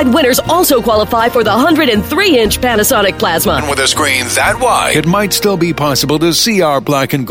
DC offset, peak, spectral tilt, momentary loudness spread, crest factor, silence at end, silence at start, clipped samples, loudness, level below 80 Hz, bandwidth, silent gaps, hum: under 0.1%; 0 dBFS; -3.5 dB/octave; 3 LU; 10 dB; 0 s; 0 s; under 0.1%; -11 LUFS; -32 dBFS; 16.5 kHz; none; none